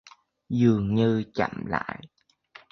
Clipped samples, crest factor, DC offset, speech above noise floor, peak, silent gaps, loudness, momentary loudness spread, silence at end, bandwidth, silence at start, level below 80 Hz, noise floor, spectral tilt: under 0.1%; 18 dB; under 0.1%; 29 dB; -8 dBFS; none; -25 LUFS; 11 LU; 0.65 s; 6.4 kHz; 0.5 s; -54 dBFS; -54 dBFS; -8 dB/octave